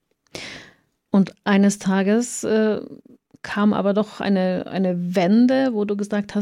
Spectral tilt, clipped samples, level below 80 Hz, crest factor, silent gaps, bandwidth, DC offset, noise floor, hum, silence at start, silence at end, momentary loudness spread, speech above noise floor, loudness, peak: -6 dB/octave; under 0.1%; -62 dBFS; 16 dB; none; 13.5 kHz; under 0.1%; -53 dBFS; none; 0.35 s; 0 s; 17 LU; 34 dB; -20 LUFS; -4 dBFS